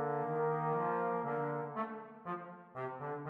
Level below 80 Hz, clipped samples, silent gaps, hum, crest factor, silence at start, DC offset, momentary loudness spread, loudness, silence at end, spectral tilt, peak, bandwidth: -86 dBFS; under 0.1%; none; none; 14 dB; 0 s; under 0.1%; 10 LU; -38 LUFS; 0 s; -10 dB/octave; -24 dBFS; 4.1 kHz